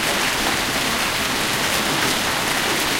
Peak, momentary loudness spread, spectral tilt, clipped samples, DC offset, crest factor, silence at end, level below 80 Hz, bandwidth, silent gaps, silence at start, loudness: -6 dBFS; 1 LU; -1.5 dB/octave; under 0.1%; under 0.1%; 16 dB; 0 s; -42 dBFS; 17 kHz; none; 0 s; -19 LUFS